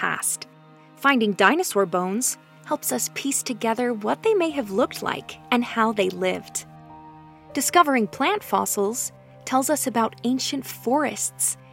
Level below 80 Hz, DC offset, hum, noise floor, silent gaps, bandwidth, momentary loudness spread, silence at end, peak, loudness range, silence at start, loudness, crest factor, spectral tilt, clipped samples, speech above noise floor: -66 dBFS; under 0.1%; none; -50 dBFS; none; 16.5 kHz; 11 LU; 0.15 s; -2 dBFS; 2 LU; 0 s; -23 LUFS; 22 dB; -3 dB/octave; under 0.1%; 27 dB